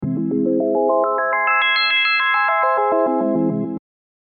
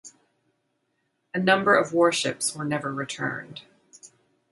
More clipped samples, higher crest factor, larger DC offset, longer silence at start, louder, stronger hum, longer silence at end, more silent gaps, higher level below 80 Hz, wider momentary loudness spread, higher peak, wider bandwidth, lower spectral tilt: neither; second, 12 dB vs 22 dB; neither; about the same, 0 s vs 0.05 s; first, -17 LUFS vs -24 LUFS; neither; about the same, 0.45 s vs 0.45 s; neither; first, -58 dBFS vs -72 dBFS; second, 7 LU vs 16 LU; about the same, -6 dBFS vs -4 dBFS; second, 5 kHz vs 11.5 kHz; first, -8.5 dB/octave vs -3.5 dB/octave